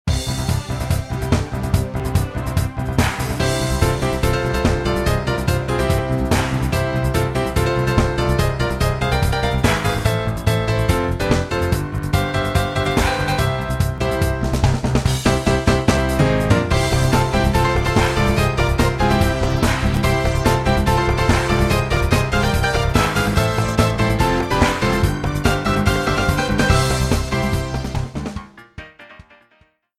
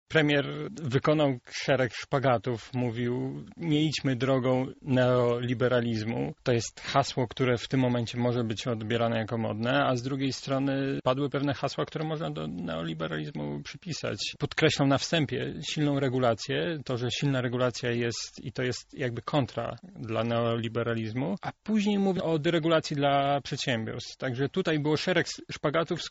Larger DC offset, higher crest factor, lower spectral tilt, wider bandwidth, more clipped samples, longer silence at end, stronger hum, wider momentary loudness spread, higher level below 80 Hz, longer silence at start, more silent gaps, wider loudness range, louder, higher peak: neither; about the same, 16 dB vs 20 dB; about the same, -5.5 dB/octave vs -5 dB/octave; first, 15.5 kHz vs 8 kHz; neither; first, 0.8 s vs 0 s; neither; second, 5 LU vs 8 LU; first, -26 dBFS vs -60 dBFS; about the same, 0.05 s vs 0.1 s; neither; about the same, 3 LU vs 4 LU; first, -19 LUFS vs -29 LUFS; first, 0 dBFS vs -10 dBFS